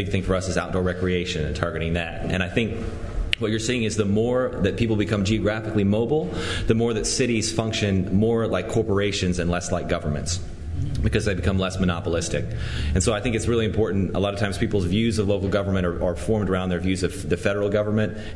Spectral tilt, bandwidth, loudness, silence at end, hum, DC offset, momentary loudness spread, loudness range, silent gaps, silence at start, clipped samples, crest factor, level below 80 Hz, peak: -5.5 dB/octave; 12 kHz; -24 LUFS; 0 s; none; under 0.1%; 5 LU; 2 LU; none; 0 s; under 0.1%; 22 dB; -36 dBFS; 0 dBFS